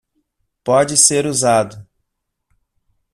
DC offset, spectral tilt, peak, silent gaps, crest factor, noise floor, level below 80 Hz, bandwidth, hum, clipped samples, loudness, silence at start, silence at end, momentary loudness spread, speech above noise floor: under 0.1%; -3 dB/octave; 0 dBFS; none; 18 dB; -75 dBFS; -56 dBFS; 15 kHz; none; under 0.1%; -13 LUFS; 0.65 s; 1.3 s; 13 LU; 60 dB